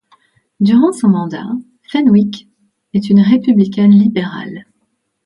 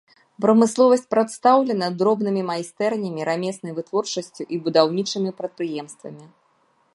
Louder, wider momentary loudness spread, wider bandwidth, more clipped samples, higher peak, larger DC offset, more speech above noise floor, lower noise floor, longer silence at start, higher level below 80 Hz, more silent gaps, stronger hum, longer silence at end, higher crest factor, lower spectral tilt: first, -12 LUFS vs -21 LUFS; first, 16 LU vs 12 LU; about the same, 11.5 kHz vs 11.5 kHz; neither; about the same, 0 dBFS vs -2 dBFS; neither; first, 55 dB vs 42 dB; about the same, -66 dBFS vs -63 dBFS; first, 0.6 s vs 0.4 s; first, -58 dBFS vs -74 dBFS; neither; neither; about the same, 0.65 s vs 0.7 s; second, 12 dB vs 20 dB; first, -8 dB/octave vs -5 dB/octave